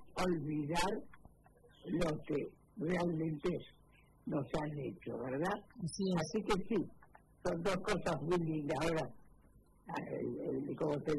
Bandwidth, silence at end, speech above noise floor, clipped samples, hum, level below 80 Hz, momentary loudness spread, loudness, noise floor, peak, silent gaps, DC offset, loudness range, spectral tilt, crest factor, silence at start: 12 kHz; 0 s; 28 dB; under 0.1%; none; -58 dBFS; 9 LU; -39 LUFS; -65 dBFS; -20 dBFS; none; under 0.1%; 3 LU; -6 dB/octave; 20 dB; 0 s